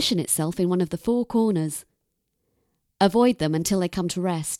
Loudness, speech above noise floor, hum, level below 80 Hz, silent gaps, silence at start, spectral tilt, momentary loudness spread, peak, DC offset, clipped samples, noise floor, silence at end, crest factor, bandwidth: -23 LUFS; 53 dB; none; -54 dBFS; none; 0 s; -5 dB/octave; 6 LU; -6 dBFS; under 0.1%; under 0.1%; -76 dBFS; 0 s; 18 dB; 16.5 kHz